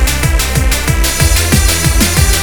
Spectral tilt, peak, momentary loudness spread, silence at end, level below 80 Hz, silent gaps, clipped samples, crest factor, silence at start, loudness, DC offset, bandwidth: -3.5 dB/octave; 0 dBFS; 3 LU; 0 s; -14 dBFS; none; 0.2%; 10 dB; 0 s; -11 LUFS; 2%; over 20 kHz